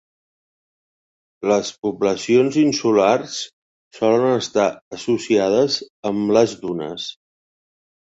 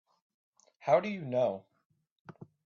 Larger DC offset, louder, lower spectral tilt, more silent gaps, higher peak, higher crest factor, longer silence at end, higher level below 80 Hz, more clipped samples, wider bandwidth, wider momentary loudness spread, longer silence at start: neither; first, -19 LUFS vs -31 LUFS; about the same, -4.5 dB/octave vs -5.5 dB/octave; first, 1.78-1.82 s, 3.53-3.91 s, 4.81-4.91 s, 5.90-6.03 s vs 1.85-1.90 s, 2.11-2.25 s; first, -2 dBFS vs -14 dBFS; about the same, 18 dB vs 22 dB; first, 0.95 s vs 0.2 s; first, -62 dBFS vs -80 dBFS; neither; first, 8 kHz vs 7 kHz; second, 12 LU vs 23 LU; first, 1.4 s vs 0.85 s